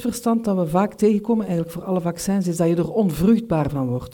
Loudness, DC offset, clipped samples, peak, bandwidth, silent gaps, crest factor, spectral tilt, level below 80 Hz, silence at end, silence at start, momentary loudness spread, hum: -21 LUFS; under 0.1%; under 0.1%; -6 dBFS; 18 kHz; none; 14 dB; -7 dB/octave; -46 dBFS; 0 s; 0 s; 6 LU; none